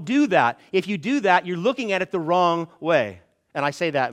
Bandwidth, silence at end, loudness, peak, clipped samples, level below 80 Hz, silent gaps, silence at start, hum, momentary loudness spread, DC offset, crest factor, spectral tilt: 11.5 kHz; 0 s; -22 LUFS; -2 dBFS; under 0.1%; -70 dBFS; none; 0 s; none; 7 LU; under 0.1%; 20 dB; -5.5 dB/octave